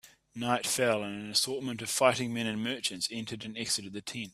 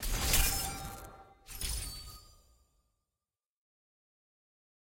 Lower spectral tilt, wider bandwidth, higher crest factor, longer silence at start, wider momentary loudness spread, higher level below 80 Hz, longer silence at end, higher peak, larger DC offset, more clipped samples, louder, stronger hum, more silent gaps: about the same, -3 dB/octave vs -2 dB/octave; about the same, 15.5 kHz vs 17 kHz; about the same, 24 dB vs 24 dB; about the same, 0.05 s vs 0 s; second, 11 LU vs 22 LU; second, -70 dBFS vs -42 dBFS; second, 0.05 s vs 2.65 s; first, -8 dBFS vs -14 dBFS; neither; neither; about the same, -31 LUFS vs -33 LUFS; neither; neither